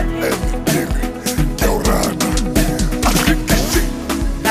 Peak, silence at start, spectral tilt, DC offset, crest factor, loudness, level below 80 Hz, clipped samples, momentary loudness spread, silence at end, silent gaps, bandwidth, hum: -2 dBFS; 0 s; -4.5 dB/octave; under 0.1%; 14 dB; -17 LUFS; -20 dBFS; under 0.1%; 6 LU; 0 s; none; 15.5 kHz; none